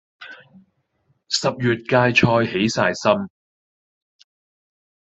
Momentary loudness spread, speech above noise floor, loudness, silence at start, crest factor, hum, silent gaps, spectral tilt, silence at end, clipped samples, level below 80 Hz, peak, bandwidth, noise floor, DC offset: 22 LU; 48 dB; -19 LUFS; 0.2 s; 20 dB; none; none; -5 dB/octave; 1.8 s; under 0.1%; -58 dBFS; -2 dBFS; 8.2 kHz; -67 dBFS; under 0.1%